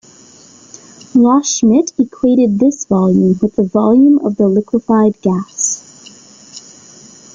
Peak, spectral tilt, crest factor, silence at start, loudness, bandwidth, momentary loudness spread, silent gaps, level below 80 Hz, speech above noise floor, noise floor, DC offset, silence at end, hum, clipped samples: -2 dBFS; -6 dB/octave; 12 dB; 1.15 s; -12 LUFS; 9.4 kHz; 7 LU; none; -52 dBFS; 30 dB; -42 dBFS; under 0.1%; 0.75 s; none; under 0.1%